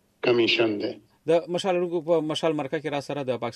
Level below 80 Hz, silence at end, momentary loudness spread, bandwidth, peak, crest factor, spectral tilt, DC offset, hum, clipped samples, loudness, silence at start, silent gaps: -72 dBFS; 0.05 s; 9 LU; 11.5 kHz; -10 dBFS; 16 dB; -5 dB/octave; under 0.1%; none; under 0.1%; -25 LUFS; 0.25 s; none